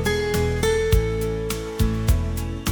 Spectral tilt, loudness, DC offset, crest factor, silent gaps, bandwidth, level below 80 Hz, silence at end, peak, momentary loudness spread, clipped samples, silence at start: -5.5 dB/octave; -23 LUFS; under 0.1%; 16 dB; none; 19.5 kHz; -28 dBFS; 0 s; -6 dBFS; 6 LU; under 0.1%; 0 s